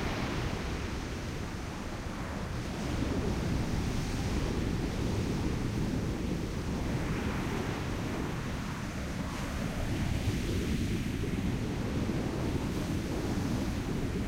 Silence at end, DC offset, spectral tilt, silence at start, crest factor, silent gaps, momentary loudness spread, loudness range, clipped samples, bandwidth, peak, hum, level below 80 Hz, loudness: 0 s; under 0.1%; -6 dB/octave; 0 s; 14 dB; none; 5 LU; 2 LU; under 0.1%; 16 kHz; -18 dBFS; none; -40 dBFS; -34 LUFS